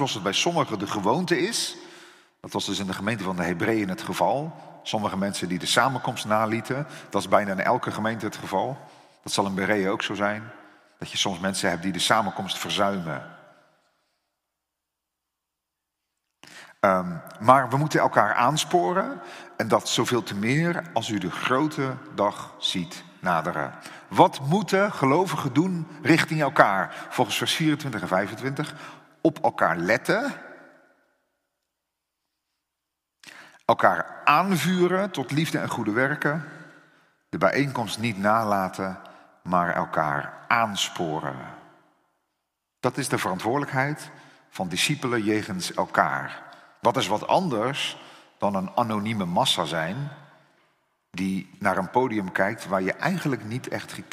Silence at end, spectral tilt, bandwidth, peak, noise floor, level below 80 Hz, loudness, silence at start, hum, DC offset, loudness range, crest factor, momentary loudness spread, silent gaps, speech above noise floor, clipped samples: 0.05 s; -4.5 dB/octave; 16 kHz; 0 dBFS; -84 dBFS; -68 dBFS; -25 LUFS; 0 s; none; under 0.1%; 6 LU; 26 dB; 12 LU; none; 59 dB; under 0.1%